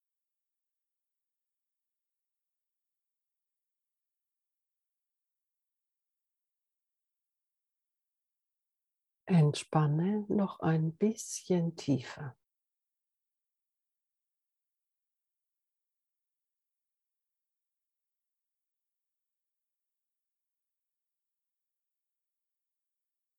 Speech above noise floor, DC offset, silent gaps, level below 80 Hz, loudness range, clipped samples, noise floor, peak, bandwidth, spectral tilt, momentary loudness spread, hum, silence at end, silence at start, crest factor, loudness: 59 dB; under 0.1%; none; -82 dBFS; 8 LU; under 0.1%; -89 dBFS; -14 dBFS; 12 kHz; -6.5 dB/octave; 11 LU; none; 11.05 s; 9.25 s; 26 dB; -31 LUFS